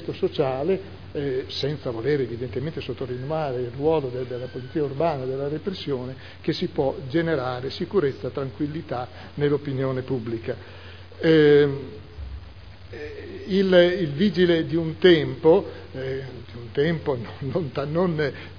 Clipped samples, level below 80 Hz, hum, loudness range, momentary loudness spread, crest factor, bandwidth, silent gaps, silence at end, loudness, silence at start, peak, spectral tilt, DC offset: under 0.1%; -50 dBFS; none; 7 LU; 18 LU; 20 dB; 5.4 kHz; none; 0 s; -24 LUFS; 0 s; -4 dBFS; -8 dB/octave; 0.4%